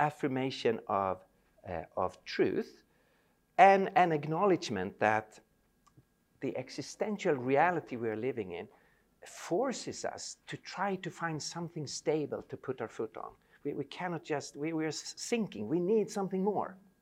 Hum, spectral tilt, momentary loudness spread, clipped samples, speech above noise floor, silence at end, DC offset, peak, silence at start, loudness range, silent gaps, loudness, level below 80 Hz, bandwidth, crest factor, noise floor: none; -5 dB/octave; 14 LU; under 0.1%; 38 dB; 0.25 s; under 0.1%; -8 dBFS; 0 s; 8 LU; none; -33 LUFS; -72 dBFS; 15 kHz; 24 dB; -71 dBFS